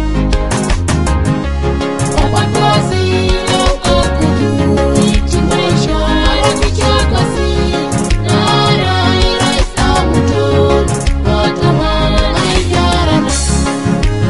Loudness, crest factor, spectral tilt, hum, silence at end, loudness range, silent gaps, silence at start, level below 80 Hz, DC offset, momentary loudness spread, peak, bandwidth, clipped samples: -12 LUFS; 12 dB; -5 dB/octave; none; 0 s; 1 LU; none; 0 s; -18 dBFS; 2%; 4 LU; 0 dBFS; 11.5 kHz; under 0.1%